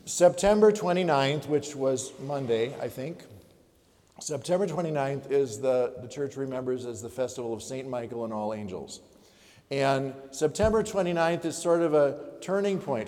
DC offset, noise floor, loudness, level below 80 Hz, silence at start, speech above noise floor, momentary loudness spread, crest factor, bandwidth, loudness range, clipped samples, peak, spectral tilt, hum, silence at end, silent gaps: under 0.1%; -62 dBFS; -28 LUFS; -54 dBFS; 0.05 s; 35 dB; 13 LU; 20 dB; 16 kHz; 7 LU; under 0.1%; -8 dBFS; -5 dB/octave; none; 0 s; none